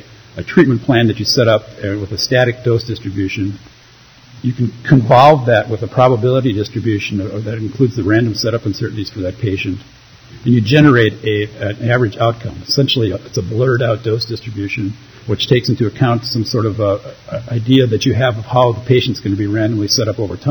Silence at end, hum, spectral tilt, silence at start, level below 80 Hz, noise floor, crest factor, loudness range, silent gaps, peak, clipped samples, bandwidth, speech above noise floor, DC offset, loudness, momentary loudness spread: 0 s; none; -6 dB/octave; 0.35 s; -46 dBFS; -44 dBFS; 14 dB; 5 LU; none; 0 dBFS; under 0.1%; 20 kHz; 29 dB; under 0.1%; -15 LUFS; 11 LU